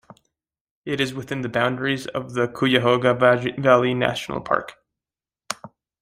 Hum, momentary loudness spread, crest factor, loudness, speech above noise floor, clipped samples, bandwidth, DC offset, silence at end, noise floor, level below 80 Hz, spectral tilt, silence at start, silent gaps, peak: none; 16 LU; 22 dB; -21 LUFS; over 69 dB; under 0.1%; 15.5 kHz; under 0.1%; 0.35 s; under -90 dBFS; -58 dBFS; -5.5 dB/octave; 0.85 s; none; -2 dBFS